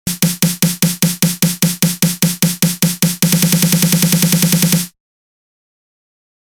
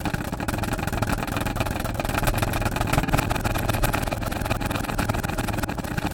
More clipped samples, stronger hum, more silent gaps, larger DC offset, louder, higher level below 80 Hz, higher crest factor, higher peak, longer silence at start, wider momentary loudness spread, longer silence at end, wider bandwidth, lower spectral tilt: neither; neither; neither; neither; first, -13 LUFS vs -26 LUFS; second, -48 dBFS vs -32 dBFS; second, 14 dB vs 20 dB; first, 0 dBFS vs -4 dBFS; about the same, 0.05 s vs 0 s; about the same, 3 LU vs 4 LU; first, 1.55 s vs 0 s; first, over 20 kHz vs 17 kHz; about the same, -4 dB/octave vs -5 dB/octave